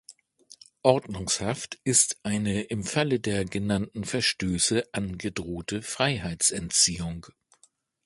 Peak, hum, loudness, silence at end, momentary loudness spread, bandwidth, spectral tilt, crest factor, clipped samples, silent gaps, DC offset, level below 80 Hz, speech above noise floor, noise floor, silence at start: -4 dBFS; none; -26 LUFS; 0.8 s; 11 LU; 12 kHz; -3 dB/octave; 24 dB; under 0.1%; none; under 0.1%; -50 dBFS; 37 dB; -64 dBFS; 0.85 s